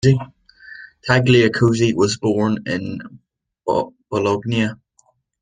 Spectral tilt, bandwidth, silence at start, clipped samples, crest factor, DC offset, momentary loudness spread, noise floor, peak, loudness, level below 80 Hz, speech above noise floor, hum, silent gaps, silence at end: -6 dB/octave; 9.6 kHz; 0.05 s; under 0.1%; 18 dB; under 0.1%; 19 LU; -61 dBFS; 0 dBFS; -18 LUFS; -50 dBFS; 43 dB; none; none; 0.65 s